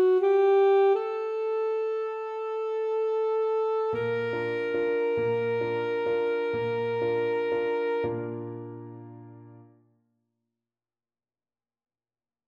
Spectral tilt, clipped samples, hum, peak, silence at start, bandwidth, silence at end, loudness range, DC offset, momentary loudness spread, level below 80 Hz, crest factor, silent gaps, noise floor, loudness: -8 dB/octave; under 0.1%; none; -16 dBFS; 0 s; 6.4 kHz; 2.85 s; 10 LU; under 0.1%; 14 LU; -70 dBFS; 12 dB; none; under -90 dBFS; -27 LUFS